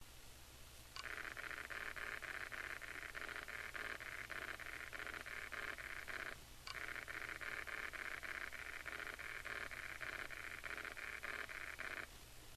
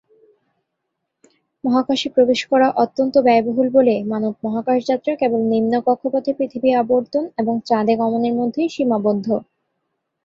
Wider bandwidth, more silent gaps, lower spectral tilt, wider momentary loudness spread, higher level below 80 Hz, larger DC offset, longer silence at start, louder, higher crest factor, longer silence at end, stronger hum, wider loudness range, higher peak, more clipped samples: first, 14 kHz vs 7.6 kHz; neither; second, -2 dB/octave vs -6 dB/octave; second, 4 LU vs 7 LU; about the same, -64 dBFS vs -62 dBFS; neither; second, 0 s vs 1.65 s; second, -48 LUFS vs -18 LUFS; about the same, 20 dB vs 16 dB; second, 0 s vs 0.85 s; neither; about the same, 1 LU vs 2 LU; second, -30 dBFS vs -2 dBFS; neither